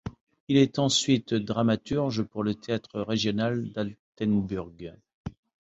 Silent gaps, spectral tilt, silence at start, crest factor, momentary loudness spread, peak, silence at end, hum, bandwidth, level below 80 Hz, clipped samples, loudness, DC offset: 0.21-0.27 s, 0.40-0.47 s, 3.99-4.13 s, 5.14-5.24 s; -5 dB/octave; 0.05 s; 20 dB; 20 LU; -8 dBFS; 0.35 s; none; 8.4 kHz; -54 dBFS; under 0.1%; -27 LUFS; under 0.1%